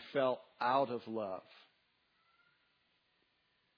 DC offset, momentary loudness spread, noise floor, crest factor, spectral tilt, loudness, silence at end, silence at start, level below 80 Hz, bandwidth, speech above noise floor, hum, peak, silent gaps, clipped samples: under 0.1%; 10 LU; -78 dBFS; 22 dB; -3 dB/octave; -37 LUFS; 2.4 s; 0 s; under -90 dBFS; 5.4 kHz; 41 dB; none; -20 dBFS; none; under 0.1%